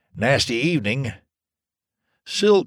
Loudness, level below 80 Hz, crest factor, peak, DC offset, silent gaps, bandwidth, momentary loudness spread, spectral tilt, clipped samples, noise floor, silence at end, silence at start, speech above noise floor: -21 LUFS; -52 dBFS; 16 dB; -6 dBFS; under 0.1%; none; 14 kHz; 9 LU; -5 dB/octave; under 0.1%; -89 dBFS; 0 s; 0.15 s; 69 dB